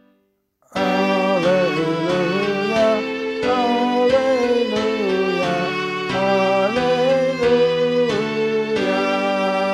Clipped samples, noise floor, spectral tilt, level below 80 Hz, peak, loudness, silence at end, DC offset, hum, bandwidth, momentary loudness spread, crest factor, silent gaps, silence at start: under 0.1%; -64 dBFS; -5.5 dB/octave; -54 dBFS; -6 dBFS; -19 LUFS; 0 s; under 0.1%; none; 12.5 kHz; 4 LU; 12 dB; none; 0.7 s